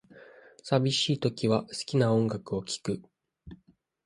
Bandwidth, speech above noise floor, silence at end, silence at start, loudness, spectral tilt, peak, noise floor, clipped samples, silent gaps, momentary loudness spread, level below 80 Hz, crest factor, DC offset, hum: 11.5 kHz; 37 dB; 0.5 s; 0.15 s; -28 LUFS; -5.5 dB/octave; -10 dBFS; -65 dBFS; under 0.1%; none; 10 LU; -62 dBFS; 20 dB; under 0.1%; none